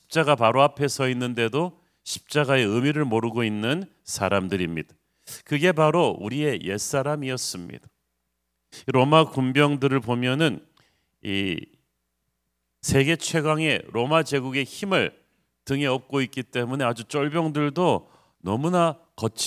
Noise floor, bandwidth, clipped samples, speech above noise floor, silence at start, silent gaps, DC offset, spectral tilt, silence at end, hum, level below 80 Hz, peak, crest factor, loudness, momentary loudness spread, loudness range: -77 dBFS; 16 kHz; under 0.1%; 54 dB; 0.1 s; none; under 0.1%; -5 dB/octave; 0 s; none; -54 dBFS; -2 dBFS; 22 dB; -24 LUFS; 12 LU; 3 LU